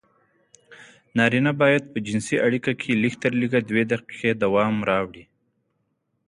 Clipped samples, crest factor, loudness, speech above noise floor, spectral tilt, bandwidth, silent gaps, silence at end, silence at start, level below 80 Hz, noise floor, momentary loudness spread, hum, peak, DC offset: under 0.1%; 18 dB; -22 LUFS; 51 dB; -6 dB/octave; 11 kHz; none; 1.05 s; 0.7 s; -60 dBFS; -73 dBFS; 6 LU; none; -6 dBFS; under 0.1%